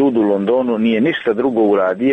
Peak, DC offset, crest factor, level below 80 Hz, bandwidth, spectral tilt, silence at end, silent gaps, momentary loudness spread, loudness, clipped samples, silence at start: -4 dBFS; under 0.1%; 10 dB; -56 dBFS; 4.3 kHz; -8.5 dB/octave; 0 s; none; 2 LU; -15 LUFS; under 0.1%; 0 s